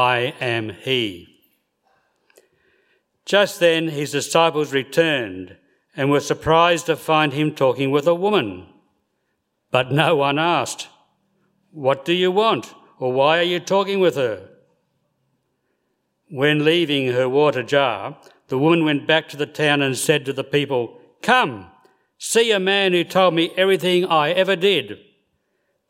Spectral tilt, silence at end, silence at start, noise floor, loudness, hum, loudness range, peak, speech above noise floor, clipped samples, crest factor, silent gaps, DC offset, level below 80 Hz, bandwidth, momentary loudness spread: -4.5 dB/octave; 0.95 s; 0 s; -72 dBFS; -19 LUFS; none; 4 LU; 0 dBFS; 54 dB; under 0.1%; 20 dB; none; under 0.1%; -60 dBFS; 16 kHz; 11 LU